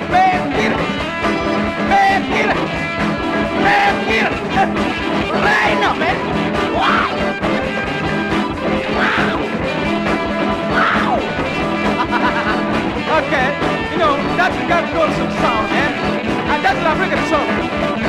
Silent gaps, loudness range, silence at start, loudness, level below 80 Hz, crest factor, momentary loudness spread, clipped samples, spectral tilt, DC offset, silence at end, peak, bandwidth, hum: none; 2 LU; 0 s; -16 LUFS; -36 dBFS; 14 dB; 5 LU; under 0.1%; -5.5 dB/octave; under 0.1%; 0 s; -2 dBFS; 13.5 kHz; none